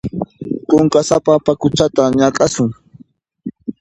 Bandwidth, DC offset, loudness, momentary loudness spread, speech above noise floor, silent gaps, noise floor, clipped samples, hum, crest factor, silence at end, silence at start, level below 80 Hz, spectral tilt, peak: 11 kHz; under 0.1%; -14 LUFS; 16 LU; 34 dB; none; -47 dBFS; under 0.1%; none; 16 dB; 0.1 s; 0.05 s; -46 dBFS; -5.5 dB/octave; 0 dBFS